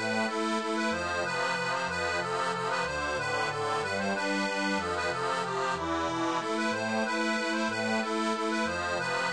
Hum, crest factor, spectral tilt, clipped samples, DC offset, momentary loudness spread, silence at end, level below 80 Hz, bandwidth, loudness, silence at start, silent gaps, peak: none; 12 dB; -3.5 dB/octave; under 0.1%; under 0.1%; 1 LU; 0 s; -60 dBFS; 10.5 kHz; -30 LUFS; 0 s; none; -18 dBFS